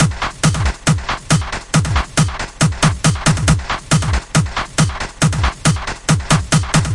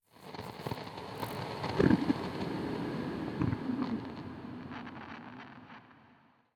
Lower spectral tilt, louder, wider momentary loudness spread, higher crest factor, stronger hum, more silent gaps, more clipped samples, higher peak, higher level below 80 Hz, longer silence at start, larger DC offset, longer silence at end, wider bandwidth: second, -4.5 dB/octave vs -7 dB/octave; first, -16 LUFS vs -36 LUFS; second, 3 LU vs 19 LU; second, 16 dB vs 24 dB; neither; neither; neither; first, 0 dBFS vs -12 dBFS; first, -26 dBFS vs -60 dBFS; second, 0 s vs 0.15 s; neither; second, 0 s vs 0.4 s; second, 11.5 kHz vs 19 kHz